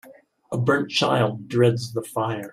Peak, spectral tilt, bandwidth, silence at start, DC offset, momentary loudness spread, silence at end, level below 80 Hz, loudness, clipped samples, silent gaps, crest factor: -6 dBFS; -5.5 dB/octave; 15 kHz; 0.05 s; under 0.1%; 8 LU; 0 s; -62 dBFS; -23 LUFS; under 0.1%; none; 18 dB